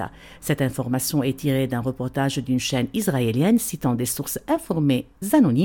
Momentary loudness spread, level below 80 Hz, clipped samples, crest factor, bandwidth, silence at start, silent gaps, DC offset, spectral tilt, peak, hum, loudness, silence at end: 6 LU; -50 dBFS; under 0.1%; 16 dB; 17.5 kHz; 0 s; none; under 0.1%; -5.5 dB/octave; -6 dBFS; none; -23 LUFS; 0 s